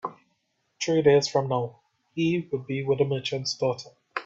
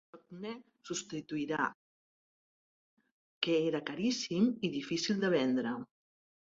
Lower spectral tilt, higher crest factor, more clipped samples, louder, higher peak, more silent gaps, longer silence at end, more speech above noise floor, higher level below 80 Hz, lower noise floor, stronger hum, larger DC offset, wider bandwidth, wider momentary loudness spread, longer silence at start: about the same, -5.5 dB/octave vs -4.5 dB/octave; about the same, 18 dB vs 22 dB; neither; first, -26 LUFS vs -34 LUFS; first, -8 dBFS vs -14 dBFS; second, none vs 1.74-2.97 s, 3.12-3.41 s; second, 0 s vs 0.6 s; second, 49 dB vs over 56 dB; first, -66 dBFS vs -76 dBFS; second, -74 dBFS vs under -90 dBFS; neither; neither; about the same, 8 kHz vs 7.8 kHz; about the same, 16 LU vs 14 LU; about the same, 0.05 s vs 0.15 s